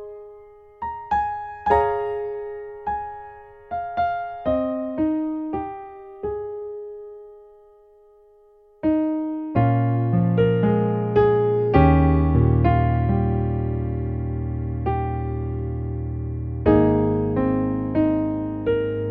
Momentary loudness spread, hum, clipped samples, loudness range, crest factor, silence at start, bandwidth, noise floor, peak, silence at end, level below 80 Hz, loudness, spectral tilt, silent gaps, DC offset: 15 LU; none; under 0.1%; 11 LU; 20 dB; 0 s; 4.6 kHz; -53 dBFS; -2 dBFS; 0 s; -34 dBFS; -22 LUFS; -11.5 dB/octave; none; under 0.1%